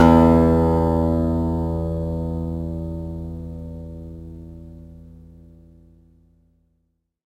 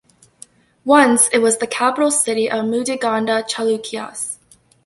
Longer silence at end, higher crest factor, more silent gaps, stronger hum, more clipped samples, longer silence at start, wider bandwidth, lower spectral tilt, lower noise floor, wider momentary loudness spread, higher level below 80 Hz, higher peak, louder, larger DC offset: first, 2.1 s vs 0.5 s; about the same, 20 dB vs 18 dB; neither; neither; neither; second, 0 s vs 0.85 s; second, 9 kHz vs 12 kHz; first, -9.5 dB/octave vs -2 dB/octave; first, -71 dBFS vs -46 dBFS; first, 24 LU vs 14 LU; first, -32 dBFS vs -64 dBFS; about the same, 0 dBFS vs 0 dBFS; second, -20 LUFS vs -17 LUFS; neither